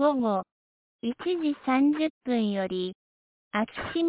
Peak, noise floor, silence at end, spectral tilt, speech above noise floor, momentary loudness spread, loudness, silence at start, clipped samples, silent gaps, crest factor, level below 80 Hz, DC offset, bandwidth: -12 dBFS; under -90 dBFS; 0 s; -4.5 dB/octave; over 63 dB; 11 LU; -28 LUFS; 0 s; under 0.1%; 0.52-0.99 s, 2.10-2.21 s, 2.95-3.51 s; 16 dB; -64 dBFS; under 0.1%; 4 kHz